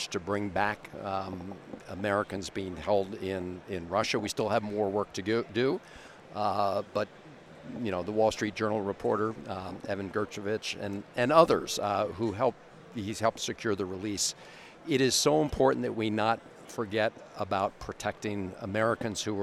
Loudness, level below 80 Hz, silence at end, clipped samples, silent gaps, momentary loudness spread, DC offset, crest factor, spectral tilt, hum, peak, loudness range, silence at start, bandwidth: -30 LUFS; -58 dBFS; 0 s; under 0.1%; none; 13 LU; under 0.1%; 26 dB; -4 dB/octave; none; -6 dBFS; 4 LU; 0 s; 15 kHz